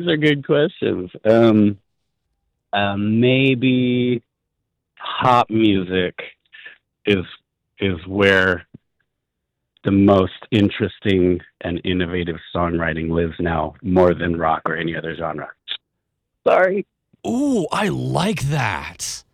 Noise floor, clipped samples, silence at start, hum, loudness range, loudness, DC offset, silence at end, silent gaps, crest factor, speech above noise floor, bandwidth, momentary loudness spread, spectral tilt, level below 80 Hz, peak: -78 dBFS; under 0.1%; 0 s; none; 3 LU; -19 LUFS; under 0.1%; 0.15 s; none; 16 dB; 60 dB; 15 kHz; 12 LU; -6 dB/octave; -46 dBFS; -4 dBFS